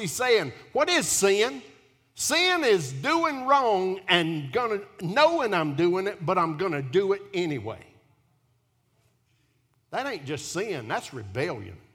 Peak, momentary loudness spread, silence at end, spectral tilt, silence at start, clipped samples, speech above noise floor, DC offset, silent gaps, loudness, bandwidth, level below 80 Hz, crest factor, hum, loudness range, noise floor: -4 dBFS; 11 LU; 0.15 s; -3.5 dB/octave; 0 s; under 0.1%; 43 dB; under 0.1%; none; -25 LUFS; 17.5 kHz; -66 dBFS; 22 dB; none; 11 LU; -69 dBFS